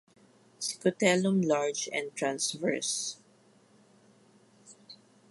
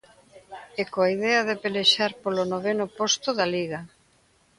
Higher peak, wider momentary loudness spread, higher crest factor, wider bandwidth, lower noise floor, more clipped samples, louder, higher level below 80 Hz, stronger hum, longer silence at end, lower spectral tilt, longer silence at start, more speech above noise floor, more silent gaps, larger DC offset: second, -10 dBFS vs -6 dBFS; second, 12 LU vs 15 LU; about the same, 22 dB vs 20 dB; about the same, 11.5 kHz vs 11.5 kHz; about the same, -63 dBFS vs -62 dBFS; neither; second, -30 LUFS vs -24 LUFS; second, -80 dBFS vs -68 dBFS; neither; second, 0.35 s vs 0.7 s; about the same, -3.5 dB/octave vs -3 dB/octave; first, 0.6 s vs 0.35 s; second, 33 dB vs 38 dB; neither; neither